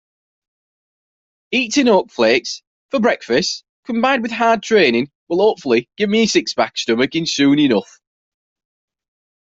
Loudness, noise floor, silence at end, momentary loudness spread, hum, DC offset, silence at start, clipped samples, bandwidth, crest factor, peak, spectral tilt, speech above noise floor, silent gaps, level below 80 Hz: -16 LUFS; under -90 dBFS; 1.65 s; 8 LU; none; under 0.1%; 1.5 s; under 0.1%; 8 kHz; 16 dB; -2 dBFS; -4 dB/octave; over 74 dB; 2.67-2.89 s, 3.69-3.83 s, 5.15-5.27 s; -60 dBFS